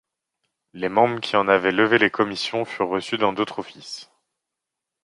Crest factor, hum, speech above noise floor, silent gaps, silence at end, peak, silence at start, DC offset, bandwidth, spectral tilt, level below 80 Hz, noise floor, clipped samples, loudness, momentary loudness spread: 22 dB; none; 63 dB; none; 1 s; -2 dBFS; 0.75 s; under 0.1%; 11.5 kHz; -5 dB/octave; -64 dBFS; -84 dBFS; under 0.1%; -21 LUFS; 16 LU